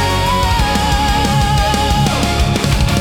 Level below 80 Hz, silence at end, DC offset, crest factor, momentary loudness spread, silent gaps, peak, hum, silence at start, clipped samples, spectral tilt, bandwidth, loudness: -20 dBFS; 0 s; under 0.1%; 12 dB; 1 LU; none; -2 dBFS; none; 0 s; under 0.1%; -4.5 dB/octave; 18 kHz; -14 LUFS